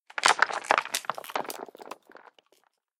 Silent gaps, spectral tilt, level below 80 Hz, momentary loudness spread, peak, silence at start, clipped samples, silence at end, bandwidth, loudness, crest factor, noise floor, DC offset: none; 0.5 dB/octave; -86 dBFS; 23 LU; -4 dBFS; 0.15 s; under 0.1%; 1.05 s; 17.5 kHz; -27 LUFS; 28 dB; -69 dBFS; under 0.1%